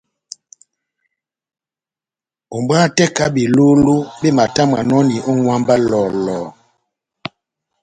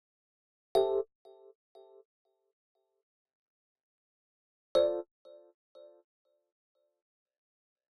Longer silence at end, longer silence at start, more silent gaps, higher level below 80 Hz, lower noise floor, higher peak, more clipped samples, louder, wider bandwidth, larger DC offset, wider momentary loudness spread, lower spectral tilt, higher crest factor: second, 1.35 s vs 2.95 s; first, 2.5 s vs 0.75 s; second, none vs 1.15-1.25 s, 1.55-1.75 s, 2.05-2.25 s, 2.53-2.75 s, 3.03-3.25 s, 3.33-3.75 s, 3.83-4.75 s; first, -50 dBFS vs -74 dBFS; about the same, under -90 dBFS vs under -90 dBFS; first, 0 dBFS vs -16 dBFS; neither; first, -14 LUFS vs -32 LUFS; second, 9.4 kHz vs 11 kHz; neither; first, 20 LU vs 14 LU; about the same, -5.5 dB/octave vs -5 dB/octave; second, 16 dB vs 24 dB